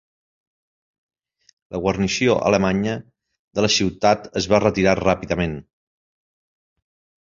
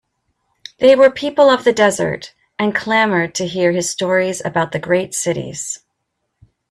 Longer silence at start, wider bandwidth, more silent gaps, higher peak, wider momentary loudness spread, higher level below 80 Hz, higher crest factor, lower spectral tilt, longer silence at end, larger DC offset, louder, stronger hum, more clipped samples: first, 1.7 s vs 0.8 s; second, 7.6 kHz vs 13.5 kHz; first, 3.39-3.51 s vs none; about the same, -2 dBFS vs 0 dBFS; second, 9 LU vs 12 LU; first, -44 dBFS vs -56 dBFS; about the same, 20 dB vs 16 dB; about the same, -4.5 dB/octave vs -4 dB/octave; first, 1.6 s vs 0.95 s; neither; second, -20 LUFS vs -16 LUFS; neither; neither